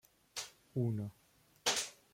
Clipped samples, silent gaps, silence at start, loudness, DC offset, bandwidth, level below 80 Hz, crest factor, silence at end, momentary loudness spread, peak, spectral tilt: under 0.1%; none; 0.35 s; -39 LUFS; under 0.1%; 16.5 kHz; -74 dBFS; 24 dB; 0.2 s; 12 LU; -18 dBFS; -3.5 dB/octave